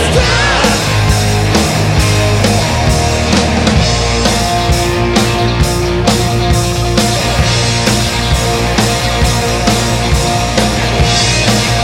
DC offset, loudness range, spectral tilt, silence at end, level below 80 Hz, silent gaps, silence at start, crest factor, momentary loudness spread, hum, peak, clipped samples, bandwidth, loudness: under 0.1%; 1 LU; -4 dB/octave; 0 s; -20 dBFS; none; 0 s; 10 dB; 2 LU; none; 0 dBFS; under 0.1%; 16.5 kHz; -11 LUFS